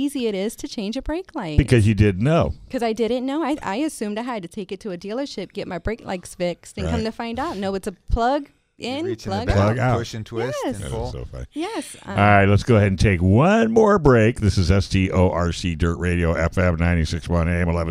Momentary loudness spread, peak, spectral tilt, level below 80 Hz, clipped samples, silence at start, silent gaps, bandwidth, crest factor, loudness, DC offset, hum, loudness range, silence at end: 13 LU; -2 dBFS; -6.5 dB/octave; -34 dBFS; under 0.1%; 0 s; none; 13.5 kHz; 20 dB; -21 LUFS; under 0.1%; none; 10 LU; 0 s